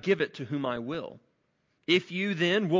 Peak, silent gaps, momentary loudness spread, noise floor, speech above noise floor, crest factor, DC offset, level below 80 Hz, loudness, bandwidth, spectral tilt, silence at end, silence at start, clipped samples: -12 dBFS; none; 12 LU; -74 dBFS; 46 dB; 18 dB; under 0.1%; -70 dBFS; -29 LUFS; 7.6 kHz; -6 dB/octave; 0 s; 0.05 s; under 0.1%